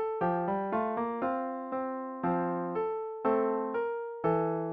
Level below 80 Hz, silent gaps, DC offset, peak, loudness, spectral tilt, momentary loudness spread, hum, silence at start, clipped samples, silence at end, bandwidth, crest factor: -68 dBFS; none; under 0.1%; -16 dBFS; -32 LUFS; -7.5 dB/octave; 6 LU; none; 0 s; under 0.1%; 0 s; 4.6 kHz; 16 dB